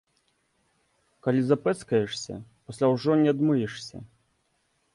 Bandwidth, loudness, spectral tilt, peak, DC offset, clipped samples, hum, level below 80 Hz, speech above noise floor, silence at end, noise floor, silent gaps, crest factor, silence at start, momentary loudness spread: 11.5 kHz; -25 LUFS; -6.5 dB/octave; -8 dBFS; under 0.1%; under 0.1%; none; -64 dBFS; 47 dB; 0.9 s; -72 dBFS; none; 18 dB; 1.25 s; 19 LU